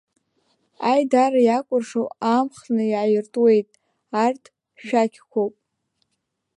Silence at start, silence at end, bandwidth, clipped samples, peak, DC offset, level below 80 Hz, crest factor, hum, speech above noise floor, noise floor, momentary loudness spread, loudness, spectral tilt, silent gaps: 0.8 s; 1.1 s; 11 kHz; under 0.1%; -6 dBFS; under 0.1%; -78 dBFS; 16 dB; none; 57 dB; -76 dBFS; 10 LU; -21 LUFS; -6 dB/octave; none